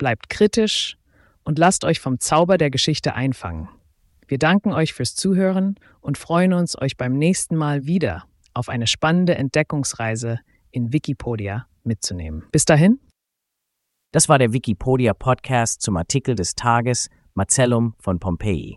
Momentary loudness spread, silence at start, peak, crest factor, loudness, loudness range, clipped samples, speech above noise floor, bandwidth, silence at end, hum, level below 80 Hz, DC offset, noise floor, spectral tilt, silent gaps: 12 LU; 0 s; 0 dBFS; 20 dB; -20 LUFS; 3 LU; under 0.1%; 61 dB; 12 kHz; 0 s; none; -44 dBFS; under 0.1%; -80 dBFS; -4.5 dB/octave; none